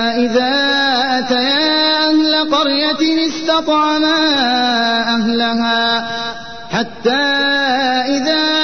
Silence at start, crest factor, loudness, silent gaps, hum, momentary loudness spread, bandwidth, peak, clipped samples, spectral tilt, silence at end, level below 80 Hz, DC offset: 0 s; 10 dB; -14 LUFS; none; none; 5 LU; 6.6 kHz; -4 dBFS; under 0.1%; -3 dB/octave; 0 s; -52 dBFS; 1%